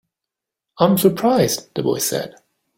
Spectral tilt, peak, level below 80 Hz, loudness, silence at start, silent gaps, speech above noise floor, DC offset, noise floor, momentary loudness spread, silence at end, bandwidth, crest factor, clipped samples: -5 dB/octave; -2 dBFS; -58 dBFS; -18 LUFS; 0.8 s; none; 67 dB; under 0.1%; -85 dBFS; 9 LU; 0.45 s; 16.5 kHz; 18 dB; under 0.1%